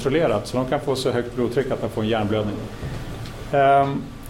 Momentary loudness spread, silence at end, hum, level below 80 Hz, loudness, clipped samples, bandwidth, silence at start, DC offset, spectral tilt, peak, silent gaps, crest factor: 15 LU; 0 s; none; -40 dBFS; -22 LUFS; under 0.1%; 16.5 kHz; 0 s; 0.2%; -6.5 dB/octave; -6 dBFS; none; 16 dB